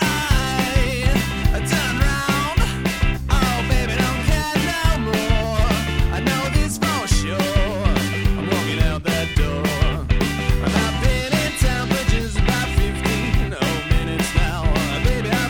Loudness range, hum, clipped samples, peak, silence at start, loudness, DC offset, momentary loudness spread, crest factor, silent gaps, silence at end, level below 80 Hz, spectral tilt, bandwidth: 1 LU; none; under 0.1%; -2 dBFS; 0 s; -20 LUFS; under 0.1%; 2 LU; 16 dB; none; 0 s; -22 dBFS; -5 dB/octave; 19.5 kHz